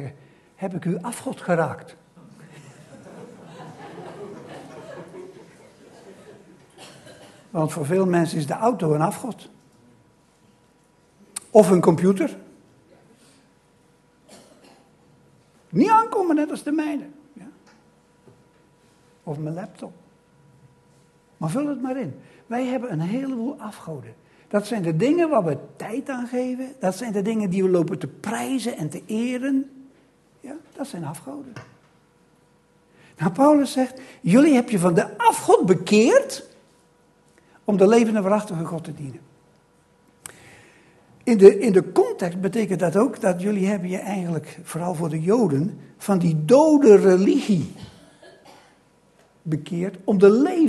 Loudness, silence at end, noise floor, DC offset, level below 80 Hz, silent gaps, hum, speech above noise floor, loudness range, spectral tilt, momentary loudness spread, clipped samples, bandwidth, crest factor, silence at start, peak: -21 LUFS; 0 s; -59 dBFS; under 0.1%; -66 dBFS; none; none; 39 dB; 20 LU; -6.5 dB/octave; 23 LU; under 0.1%; 12.5 kHz; 22 dB; 0 s; 0 dBFS